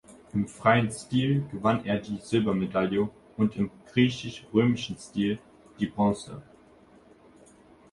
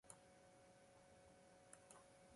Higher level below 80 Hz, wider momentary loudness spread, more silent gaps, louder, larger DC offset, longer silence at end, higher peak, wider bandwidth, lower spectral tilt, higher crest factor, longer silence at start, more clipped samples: first, -58 dBFS vs -84 dBFS; first, 9 LU vs 5 LU; neither; first, -28 LUFS vs -67 LUFS; neither; first, 1.5 s vs 0 s; first, -8 dBFS vs -40 dBFS; about the same, 11.5 kHz vs 11.5 kHz; first, -6.5 dB/octave vs -3 dB/octave; second, 20 dB vs 28 dB; first, 0.35 s vs 0.05 s; neither